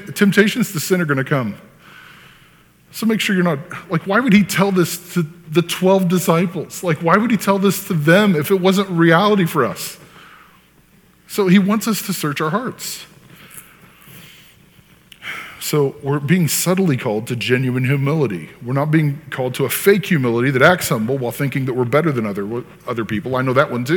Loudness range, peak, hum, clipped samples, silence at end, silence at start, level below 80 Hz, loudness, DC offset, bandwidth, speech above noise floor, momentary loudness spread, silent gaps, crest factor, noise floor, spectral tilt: 6 LU; 0 dBFS; none; under 0.1%; 0 s; 0 s; -58 dBFS; -17 LUFS; under 0.1%; 19 kHz; 35 dB; 13 LU; none; 18 dB; -51 dBFS; -5.5 dB/octave